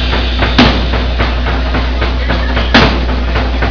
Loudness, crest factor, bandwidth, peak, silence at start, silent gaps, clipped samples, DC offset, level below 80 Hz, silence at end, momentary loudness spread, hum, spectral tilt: -12 LUFS; 12 dB; 5.4 kHz; 0 dBFS; 0 s; none; 0.5%; 3%; -14 dBFS; 0 s; 7 LU; none; -6 dB/octave